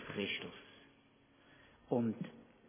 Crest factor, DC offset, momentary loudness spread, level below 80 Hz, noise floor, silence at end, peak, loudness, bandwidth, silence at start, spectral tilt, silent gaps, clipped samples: 22 dB; under 0.1%; 21 LU; -76 dBFS; -68 dBFS; 0 s; -22 dBFS; -40 LUFS; 3.6 kHz; 0 s; -4 dB/octave; none; under 0.1%